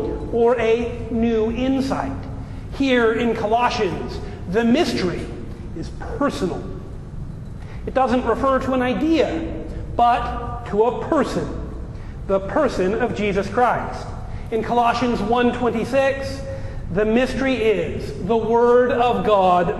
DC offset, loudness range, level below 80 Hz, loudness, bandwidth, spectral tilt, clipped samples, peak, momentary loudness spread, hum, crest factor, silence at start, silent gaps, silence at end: under 0.1%; 4 LU; -34 dBFS; -20 LUFS; 12.5 kHz; -6.5 dB/octave; under 0.1%; -4 dBFS; 15 LU; none; 16 dB; 0 s; none; 0 s